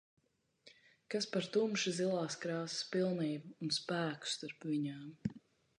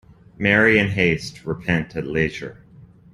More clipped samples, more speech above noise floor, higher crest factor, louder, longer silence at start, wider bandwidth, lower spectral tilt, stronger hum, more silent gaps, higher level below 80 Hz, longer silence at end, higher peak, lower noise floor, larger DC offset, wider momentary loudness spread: neither; about the same, 30 dB vs 27 dB; about the same, 18 dB vs 20 dB; second, -38 LUFS vs -20 LUFS; first, 0.65 s vs 0.4 s; second, 11 kHz vs 12.5 kHz; second, -4.5 dB/octave vs -6 dB/octave; neither; neither; second, -76 dBFS vs -46 dBFS; about the same, 0.4 s vs 0.3 s; second, -22 dBFS vs -2 dBFS; first, -68 dBFS vs -47 dBFS; neither; second, 8 LU vs 14 LU